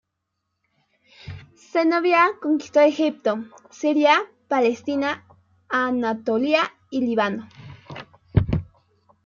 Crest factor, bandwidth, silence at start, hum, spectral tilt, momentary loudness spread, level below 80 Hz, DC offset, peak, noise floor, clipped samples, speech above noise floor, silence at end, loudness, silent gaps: 20 dB; 7.4 kHz; 1.25 s; none; -6.5 dB/octave; 22 LU; -46 dBFS; under 0.1%; -4 dBFS; -78 dBFS; under 0.1%; 58 dB; 0.6 s; -21 LUFS; none